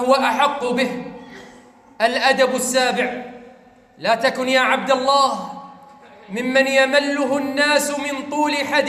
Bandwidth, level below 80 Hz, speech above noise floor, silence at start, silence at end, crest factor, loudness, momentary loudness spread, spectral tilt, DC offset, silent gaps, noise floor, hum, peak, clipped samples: 16 kHz; -64 dBFS; 30 dB; 0 s; 0 s; 16 dB; -18 LUFS; 15 LU; -2.5 dB/octave; under 0.1%; none; -48 dBFS; none; -4 dBFS; under 0.1%